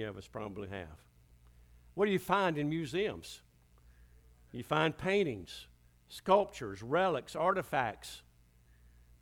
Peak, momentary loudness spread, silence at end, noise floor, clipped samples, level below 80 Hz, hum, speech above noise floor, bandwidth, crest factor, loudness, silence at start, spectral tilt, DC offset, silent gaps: -14 dBFS; 19 LU; 1 s; -64 dBFS; under 0.1%; -62 dBFS; 60 Hz at -65 dBFS; 30 dB; 19 kHz; 22 dB; -34 LUFS; 0 s; -5.5 dB/octave; under 0.1%; none